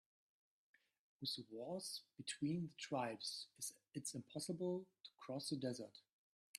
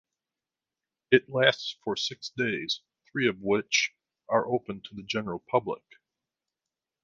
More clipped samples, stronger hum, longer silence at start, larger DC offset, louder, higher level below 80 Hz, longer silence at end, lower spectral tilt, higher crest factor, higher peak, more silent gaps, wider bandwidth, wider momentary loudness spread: neither; neither; about the same, 1.2 s vs 1.1 s; neither; second, -47 LUFS vs -28 LUFS; second, -88 dBFS vs -68 dBFS; second, 0 s vs 1.25 s; about the same, -4 dB/octave vs -3.5 dB/octave; second, 20 dB vs 26 dB; second, -30 dBFS vs -4 dBFS; first, 6.13-6.54 s vs none; first, 15 kHz vs 7.6 kHz; second, 7 LU vs 10 LU